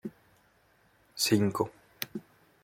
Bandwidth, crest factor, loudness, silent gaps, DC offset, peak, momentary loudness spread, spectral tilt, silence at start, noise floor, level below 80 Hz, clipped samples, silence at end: 16.5 kHz; 22 dB; -30 LUFS; none; under 0.1%; -12 dBFS; 20 LU; -4.5 dB/octave; 0.05 s; -66 dBFS; -70 dBFS; under 0.1%; 0.45 s